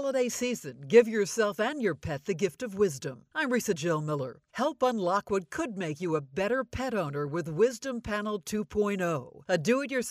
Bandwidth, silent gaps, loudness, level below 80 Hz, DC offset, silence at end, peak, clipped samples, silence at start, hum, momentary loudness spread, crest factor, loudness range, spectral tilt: 15.5 kHz; none; -30 LUFS; -58 dBFS; under 0.1%; 0 s; -8 dBFS; under 0.1%; 0 s; none; 7 LU; 20 dB; 3 LU; -5 dB/octave